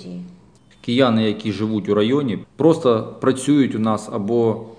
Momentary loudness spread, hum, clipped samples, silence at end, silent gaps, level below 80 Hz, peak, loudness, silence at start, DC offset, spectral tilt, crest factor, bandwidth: 7 LU; none; under 0.1%; 0.05 s; none; -62 dBFS; -2 dBFS; -19 LUFS; 0 s; 0.1%; -6.5 dB/octave; 18 dB; 10 kHz